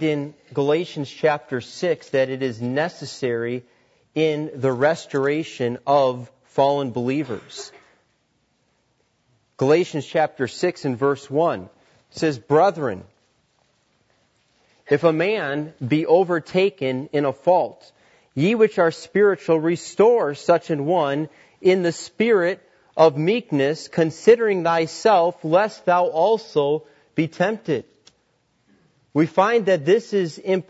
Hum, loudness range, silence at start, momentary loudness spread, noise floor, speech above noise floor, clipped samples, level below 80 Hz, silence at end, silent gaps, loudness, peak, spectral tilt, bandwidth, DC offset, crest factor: none; 6 LU; 0 s; 10 LU; -67 dBFS; 47 dB; under 0.1%; -70 dBFS; 0.1 s; none; -21 LUFS; -2 dBFS; -6 dB/octave; 8 kHz; under 0.1%; 20 dB